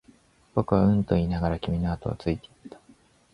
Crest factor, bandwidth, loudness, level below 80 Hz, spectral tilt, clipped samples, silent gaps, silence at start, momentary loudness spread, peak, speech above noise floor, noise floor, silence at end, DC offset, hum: 20 dB; 10.5 kHz; -26 LUFS; -40 dBFS; -9.5 dB/octave; under 0.1%; none; 0.55 s; 9 LU; -6 dBFS; 33 dB; -58 dBFS; 0.65 s; under 0.1%; none